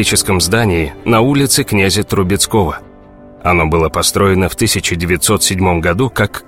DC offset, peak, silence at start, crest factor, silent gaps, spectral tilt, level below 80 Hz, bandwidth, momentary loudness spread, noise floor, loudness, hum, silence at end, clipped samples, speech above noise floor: 0.2%; 0 dBFS; 0 s; 14 dB; none; -4 dB/octave; -30 dBFS; 16.5 kHz; 4 LU; -38 dBFS; -13 LUFS; none; 0.05 s; under 0.1%; 25 dB